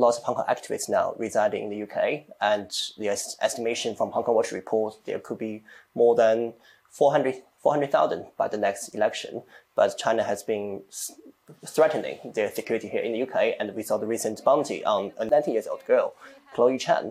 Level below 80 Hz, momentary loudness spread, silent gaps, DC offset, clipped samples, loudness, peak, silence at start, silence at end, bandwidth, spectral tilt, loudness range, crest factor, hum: -74 dBFS; 11 LU; none; under 0.1%; under 0.1%; -26 LUFS; -8 dBFS; 0 s; 0 s; 15.5 kHz; -3.5 dB/octave; 3 LU; 16 dB; none